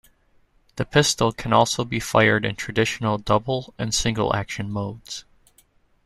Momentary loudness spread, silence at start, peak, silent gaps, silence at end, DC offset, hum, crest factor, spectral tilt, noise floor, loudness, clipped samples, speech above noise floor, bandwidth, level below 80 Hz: 13 LU; 0.75 s; -2 dBFS; none; 0.85 s; under 0.1%; none; 22 dB; -4 dB/octave; -60 dBFS; -22 LUFS; under 0.1%; 38 dB; 13.5 kHz; -46 dBFS